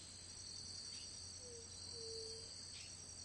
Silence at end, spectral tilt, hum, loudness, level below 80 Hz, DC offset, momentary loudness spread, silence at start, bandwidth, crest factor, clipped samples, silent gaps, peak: 0 s; -1.5 dB/octave; none; -50 LUFS; -72 dBFS; under 0.1%; 4 LU; 0 s; 11.5 kHz; 14 dB; under 0.1%; none; -38 dBFS